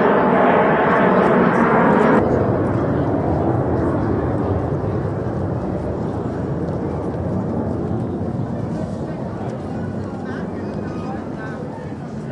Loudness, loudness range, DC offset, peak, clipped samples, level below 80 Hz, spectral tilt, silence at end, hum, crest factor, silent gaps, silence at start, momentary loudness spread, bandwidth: -20 LUFS; 10 LU; under 0.1%; -2 dBFS; under 0.1%; -40 dBFS; -9 dB/octave; 0 s; none; 16 dB; none; 0 s; 12 LU; 10.5 kHz